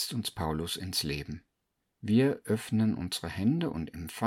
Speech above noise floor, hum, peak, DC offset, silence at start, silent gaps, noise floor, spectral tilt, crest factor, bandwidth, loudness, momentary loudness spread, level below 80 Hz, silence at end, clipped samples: 51 dB; none; -14 dBFS; under 0.1%; 0 s; none; -81 dBFS; -5.5 dB/octave; 18 dB; 17 kHz; -31 LUFS; 12 LU; -52 dBFS; 0 s; under 0.1%